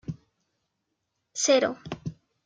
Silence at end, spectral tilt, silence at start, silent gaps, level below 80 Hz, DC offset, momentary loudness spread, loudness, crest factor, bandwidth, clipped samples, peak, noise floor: 0.35 s; -3 dB/octave; 0.1 s; none; -62 dBFS; under 0.1%; 18 LU; -25 LUFS; 20 dB; 9.6 kHz; under 0.1%; -10 dBFS; -80 dBFS